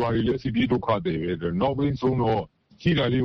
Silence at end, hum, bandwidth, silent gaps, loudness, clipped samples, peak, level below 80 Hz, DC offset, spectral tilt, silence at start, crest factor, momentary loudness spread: 0 s; none; 6.4 kHz; none; -25 LUFS; under 0.1%; -8 dBFS; -46 dBFS; under 0.1%; -8.5 dB/octave; 0 s; 16 dB; 5 LU